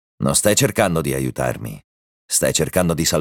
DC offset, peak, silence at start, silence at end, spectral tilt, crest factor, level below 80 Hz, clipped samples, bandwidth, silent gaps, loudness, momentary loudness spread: under 0.1%; 0 dBFS; 0.2 s; 0 s; -3.5 dB/octave; 18 dB; -42 dBFS; under 0.1%; 19 kHz; 1.84-2.28 s; -18 LUFS; 9 LU